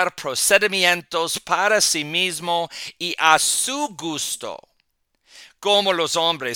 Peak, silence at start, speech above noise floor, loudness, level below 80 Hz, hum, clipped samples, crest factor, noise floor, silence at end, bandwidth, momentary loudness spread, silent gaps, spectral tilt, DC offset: 0 dBFS; 0 s; 48 dB; -19 LUFS; -64 dBFS; none; under 0.1%; 22 dB; -69 dBFS; 0 s; 19 kHz; 11 LU; none; -1 dB/octave; under 0.1%